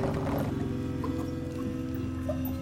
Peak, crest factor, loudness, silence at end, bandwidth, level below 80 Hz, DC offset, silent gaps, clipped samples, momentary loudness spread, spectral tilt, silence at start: -18 dBFS; 14 dB; -33 LUFS; 0 s; 16.5 kHz; -46 dBFS; under 0.1%; none; under 0.1%; 4 LU; -8 dB/octave; 0 s